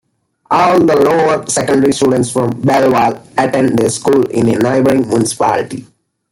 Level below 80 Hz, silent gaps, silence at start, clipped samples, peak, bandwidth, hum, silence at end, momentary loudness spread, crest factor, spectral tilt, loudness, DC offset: -50 dBFS; none; 0.5 s; under 0.1%; 0 dBFS; 16.5 kHz; none; 0.5 s; 5 LU; 12 dB; -5.5 dB/octave; -12 LUFS; under 0.1%